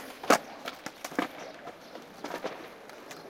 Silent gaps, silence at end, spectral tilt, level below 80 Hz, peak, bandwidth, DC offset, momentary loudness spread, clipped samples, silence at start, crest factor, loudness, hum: none; 0 s; -2.5 dB/octave; -74 dBFS; -6 dBFS; 16.5 kHz; under 0.1%; 19 LU; under 0.1%; 0 s; 30 dB; -33 LUFS; none